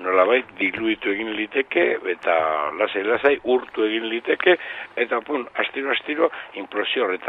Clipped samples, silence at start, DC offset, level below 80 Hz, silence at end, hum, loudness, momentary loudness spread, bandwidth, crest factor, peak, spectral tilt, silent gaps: under 0.1%; 0 s; under 0.1%; -64 dBFS; 0 s; none; -22 LUFS; 6 LU; 4.8 kHz; 20 dB; -2 dBFS; -6 dB/octave; none